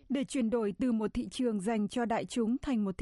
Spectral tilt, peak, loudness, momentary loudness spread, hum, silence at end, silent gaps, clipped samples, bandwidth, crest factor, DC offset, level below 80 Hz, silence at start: -6 dB/octave; -20 dBFS; -32 LUFS; 2 LU; none; 0.05 s; none; under 0.1%; 11.5 kHz; 12 dB; under 0.1%; -56 dBFS; 0.1 s